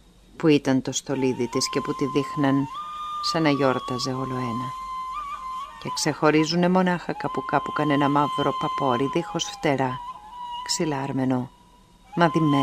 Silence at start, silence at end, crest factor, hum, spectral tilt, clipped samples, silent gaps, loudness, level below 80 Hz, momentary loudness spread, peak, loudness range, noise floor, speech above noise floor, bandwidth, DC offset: 0.35 s; 0 s; 22 dB; none; -5 dB/octave; under 0.1%; none; -24 LUFS; -56 dBFS; 12 LU; -2 dBFS; 4 LU; -53 dBFS; 30 dB; 15.5 kHz; under 0.1%